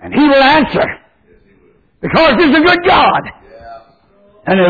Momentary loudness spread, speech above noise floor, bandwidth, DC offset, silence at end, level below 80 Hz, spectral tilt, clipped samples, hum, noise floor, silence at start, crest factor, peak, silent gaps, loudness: 17 LU; 41 dB; 5 kHz; under 0.1%; 0 s; -38 dBFS; -7 dB/octave; under 0.1%; none; -50 dBFS; 0 s; 12 dB; 0 dBFS; none; -10 LUFS